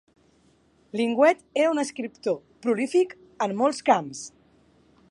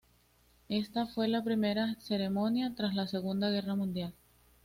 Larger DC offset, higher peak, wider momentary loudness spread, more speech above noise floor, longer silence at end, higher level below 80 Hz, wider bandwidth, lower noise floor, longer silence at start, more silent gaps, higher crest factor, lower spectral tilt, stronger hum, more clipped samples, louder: neither; first, -6 dBFS vs -20 dBFS; first, 12 LU vs 5 LU; about the same, 38 dB vs 35 dB; first, 0.8 s vs 0.55 s; second, -72 dBFS vs -66 dBFS; second, 11.5 kHz vs 15.5 kHz; second, -62 dBFS vs -67 dBFS; first, 0.95 s vs 0.7 s; neither; first, 20 dB vs 14 dB; second, -4.5 dB/octave vs -7 dB/octave; neither; neither; first, -25 LUFS vs -33 LUFS